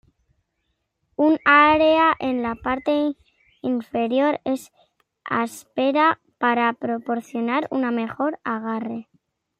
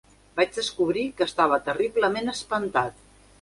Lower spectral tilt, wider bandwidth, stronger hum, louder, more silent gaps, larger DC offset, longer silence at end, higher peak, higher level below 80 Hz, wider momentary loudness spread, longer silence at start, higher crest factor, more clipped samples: about the same, -5 dB/octave vs -4 dB/octave; first, 15 kHz vs 11.5 kHz; neither; first, -21 LUFS vs -25 LUFS; neither; neither; about the same, 0.6 s vs 0.5 s; first, -4 dBFS vs -8 dBFS; about the same, -58 dBFS vs -58 dBFS; first, 13 LU vs 6 LU; first, 1.2 s vs 0.35 s; about the same, 20 dB vs 18 dB; neither